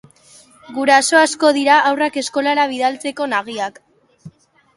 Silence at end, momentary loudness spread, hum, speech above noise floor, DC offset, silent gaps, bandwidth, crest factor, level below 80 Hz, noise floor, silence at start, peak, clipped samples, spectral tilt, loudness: 0.45 s; 13 LU; none; 32 dB; under 0.1%; none; 11.5 kHz; 18 dB; -68 dBFS; -48 dBFS; 0.7 s; 0 dBFS; under 0.1%; -2 dB/octave; -16 LUFS